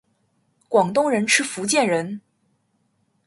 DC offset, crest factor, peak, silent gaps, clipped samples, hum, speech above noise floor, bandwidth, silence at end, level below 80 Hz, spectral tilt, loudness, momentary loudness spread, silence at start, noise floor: under 0.1%; 22 dB; -2 dBFS; none; under 0.1%; none; 48 dB; 11.5 kHz; 1.05 s; -70 dBFS; -3 dB/octave; -20 LUFS; 10 LU; 0.7 s; -68 dBFS